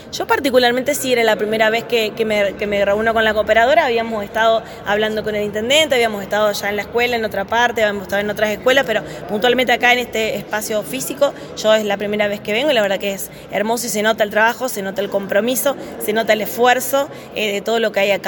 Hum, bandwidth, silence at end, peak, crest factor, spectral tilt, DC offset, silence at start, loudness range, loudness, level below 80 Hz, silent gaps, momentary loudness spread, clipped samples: none; 17.5 kHz; 0 s; 0 dBFS; 18 dB; -3 dB/octave; under 0.1%; 0 s; 2 LU; -17 LUFS; -48 dBFS; none; 7 LU; under 0.1%